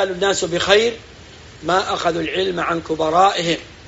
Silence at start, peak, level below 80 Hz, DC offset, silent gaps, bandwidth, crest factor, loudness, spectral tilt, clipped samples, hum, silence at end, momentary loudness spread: 0 s; 0 dBFS; -48 dBFS; under 0.1%; none; 8 kHz; 18 dB; -18 LUFS; -2 dB/octave; under 0.1%; none; 0 s; 7 LU